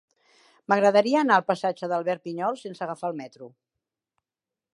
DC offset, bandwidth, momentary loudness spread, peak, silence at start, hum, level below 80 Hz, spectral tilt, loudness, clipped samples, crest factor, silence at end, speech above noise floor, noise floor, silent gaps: under 0.1%; 11.5 kHz; 15 LU; -6 dBFS; 0.7 s; none; -82 dBFS; -5.5 dB/octave; -24 LUFS; under 0.1%; 22 dB; 1.25 s; over 66 dB; under -90 dBFS; none